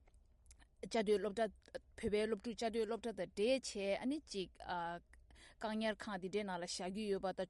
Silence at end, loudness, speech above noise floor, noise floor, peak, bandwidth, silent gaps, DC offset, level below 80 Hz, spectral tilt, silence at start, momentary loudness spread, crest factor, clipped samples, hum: 0 s; -41 LUFS; 26 dB; -67 dBFS; -24 dBFS; 11.5 kHz; none; under 0.1%; -66 dBFS; -4.5 dB/octave; 0.15 s; 9 LU; 18 dB; under 0.1%; none